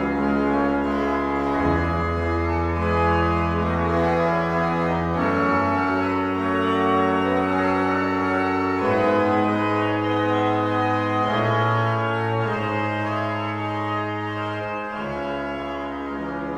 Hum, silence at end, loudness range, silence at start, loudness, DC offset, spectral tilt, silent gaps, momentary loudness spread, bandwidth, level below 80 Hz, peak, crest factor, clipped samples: none; 0 s; 4 LU; 0 s; -22 LUFS; under 0.1%; -7.5 dB/octave; none; 7 LU; 10 kHz; -40 dBFS; -8 dBFS; 14 dB; under 0.1%